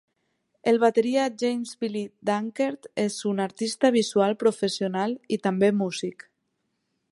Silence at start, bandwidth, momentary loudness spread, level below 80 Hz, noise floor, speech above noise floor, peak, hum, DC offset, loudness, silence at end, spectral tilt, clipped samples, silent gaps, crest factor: 0.65 s; 11.5 kHz; 9 LU; -72 dBFS; -76 dBFS; 52 dB; -8 dBFS; none; under 0.1%; -25 LUFS; 1 s; -5 dB/octave; under 0.1%; none; 18 dB